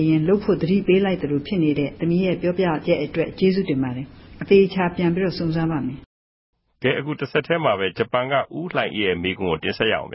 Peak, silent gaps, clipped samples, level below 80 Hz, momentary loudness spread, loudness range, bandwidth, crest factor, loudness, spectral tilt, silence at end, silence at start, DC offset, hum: -4 dBFS; 6.06-6.53 s; under 0.1%; -48 dBFS; 7 LU; 3 LU; 5.8 kHz; 18 dB; -21 LUFS; -11 dB/octave; 0 s; 0 s; under 0.1%; none